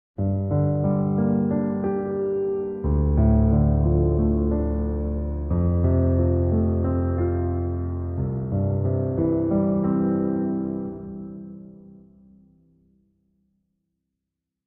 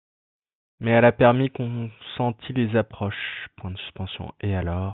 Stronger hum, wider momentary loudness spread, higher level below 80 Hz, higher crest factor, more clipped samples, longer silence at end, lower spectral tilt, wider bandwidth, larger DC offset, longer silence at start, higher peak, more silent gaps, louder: neither; second, 8 LU vs 16 LU; first, -30 dBFS vs -52 dBFS; second, 14 dB vs 20 dB; neither; first, 2.95 s vs 0 s; first, -15 dB/octave vs -11 dB/octave; second, 2.5 kHz vs 4.1 kHz; neither; second, 0.2 s vs 0.8 s; second, -8 dBFS vs -4 dBFS; neither; about the same, -23 LUFS vs -24 LUFS